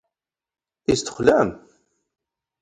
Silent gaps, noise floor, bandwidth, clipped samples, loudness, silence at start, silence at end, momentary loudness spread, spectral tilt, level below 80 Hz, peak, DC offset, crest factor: none; -87 dBFS; 11 kHz; under 0.1%; -21 LUFS; 0.9 s; 1.05 s; 8 LU; -4.5 dB/octave; -52 dBFS; -2 dBFS; under 0.1%; 22 dB